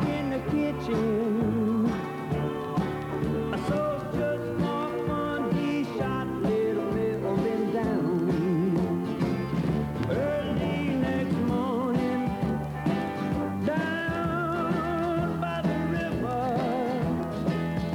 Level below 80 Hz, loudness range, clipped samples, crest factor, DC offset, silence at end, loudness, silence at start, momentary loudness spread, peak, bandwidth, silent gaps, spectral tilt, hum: -48 dBFS; 2 LU; under 0.1%; 12 dB; under 0.1%; 0 s; -28 LUFS; 0 s; 3 LU; -14 dBFS; 18 kHz; none; -8 dB/octave; none